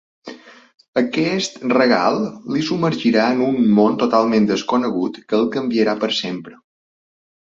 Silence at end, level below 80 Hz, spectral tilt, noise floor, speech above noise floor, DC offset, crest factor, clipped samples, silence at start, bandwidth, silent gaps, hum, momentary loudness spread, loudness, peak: 0.95 s; -60 dBFS; -5.5 dB/octave; -38 dBFS; 21 dB; under 0.1%; 18 dB; under 0.1%; 0.25 s; 7.8 kHz; 0.88-0.93 s; none; 9 LU; -18 LUFS; -2 dBFS